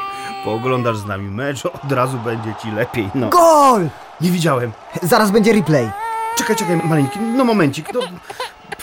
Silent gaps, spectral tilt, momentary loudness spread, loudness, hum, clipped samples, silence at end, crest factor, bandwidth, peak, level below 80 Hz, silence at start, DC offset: none; -5.5 dB/octave; 13 LU; -17 LUFS; none; under 0.1%; 0 s; 14 dB; 17 kHz; -2 dBFS; -52 dBFS; 0 s; under 0.1%